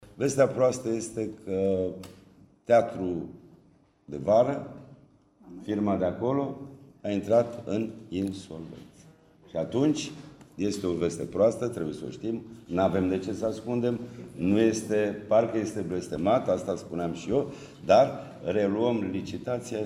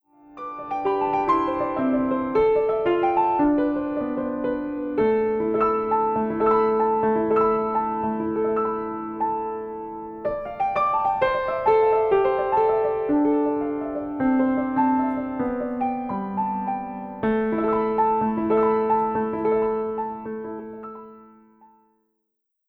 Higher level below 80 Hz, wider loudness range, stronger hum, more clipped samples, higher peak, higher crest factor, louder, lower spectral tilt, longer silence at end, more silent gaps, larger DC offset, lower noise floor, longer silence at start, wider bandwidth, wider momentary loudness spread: second, -60 dBFS vs -52 dBFS; about the same, 4 LU vs 4 LU; neither; neither; about the same, -8 dBFS vs -8 dBFS; about the same, 20 dB vs 16 dB; second, -28 LUFS vs -23 LUFS; second, -6.5 dB/octave vs -9 dB/octave; second, 0 s vs 1.45 s; neither; neither; second, -61 dBFS vs -78 dBFS; second, 0 s vs 0.3 s; first, 14 kHz vs 5.2 kHz; first, 16 LU vs 10 LU